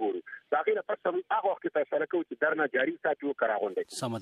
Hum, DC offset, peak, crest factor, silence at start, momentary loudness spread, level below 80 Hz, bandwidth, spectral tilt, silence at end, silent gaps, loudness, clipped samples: none; under 0.1%; -14 dBFS; 16 dB; 0 s; 5 LU; -86 dBFS; 13.5 kHz; -5 dB/octave; 0 s; none; -30 LUFS; under 0.1%